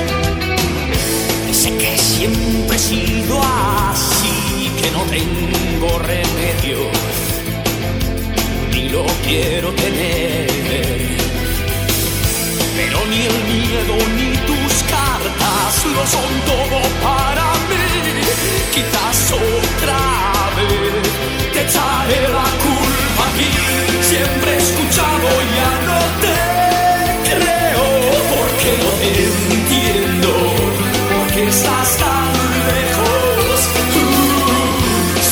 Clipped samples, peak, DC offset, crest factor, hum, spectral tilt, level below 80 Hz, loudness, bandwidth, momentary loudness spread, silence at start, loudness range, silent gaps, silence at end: under 0.1%; -2 dBFS; under 0.1%; 14 dB; none; -3.5 dB/octave; -26 dBFS; -15 LUFS; over 20 kHz; 4 LU; 0 s; 4 LU; none; 0 s